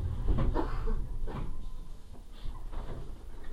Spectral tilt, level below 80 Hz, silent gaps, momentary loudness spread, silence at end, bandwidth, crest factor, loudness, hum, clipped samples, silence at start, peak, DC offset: -8 dB/octave; -34 dBFS; none; 18 LU; 0 s; 5.2 kHz; 16 dB; -38 LUFS; none; under 0.1%; 0 s; -16 dBFS; 0.4%